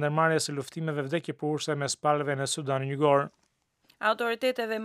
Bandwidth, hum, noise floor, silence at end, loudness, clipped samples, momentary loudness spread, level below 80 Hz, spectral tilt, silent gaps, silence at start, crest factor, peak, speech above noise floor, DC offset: 15 kHz; none; -67 dBFS; 0 s; -28 LUFS; under 0.1%; 8 LU; -80 dBFS; -4.5 dB/octave; none; 0 s; 20 dB; -10 dBFS; 39 dB; under 0.1%